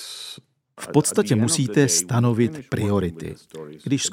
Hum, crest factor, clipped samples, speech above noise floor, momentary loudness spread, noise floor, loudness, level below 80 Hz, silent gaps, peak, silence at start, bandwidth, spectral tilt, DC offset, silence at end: none; 20 dB; under 0.1%; 25 dB; 19 LU; -46 dBFS; -21 LUFS; -54 dBFS; none; -2 dBFS; 0 s; 16.5 kHz; -4.5 dB/octave; under 0.1%; 0 s